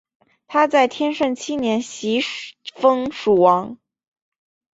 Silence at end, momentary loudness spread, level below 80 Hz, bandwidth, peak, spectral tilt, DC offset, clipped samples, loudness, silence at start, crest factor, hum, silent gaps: 1.05 s; 10 LU; -62 dBFS; 8 kHz; -2 dBFS; -4.5 dB/octave; under 0.1%; under 0.1%; -19 LUFS; 0.5 s; 18 dB; none; none